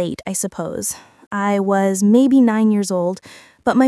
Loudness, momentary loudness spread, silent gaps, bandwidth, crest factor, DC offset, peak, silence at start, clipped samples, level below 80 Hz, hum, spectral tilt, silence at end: -17 LUFS; 12 LU; 1.27-1.31 s; 12 kHz; 16 dB; under 0.1%; -2 dBFS; 0 s; under 0.1%; -60 dBFS; none; -5.5 dB/octave; 0 s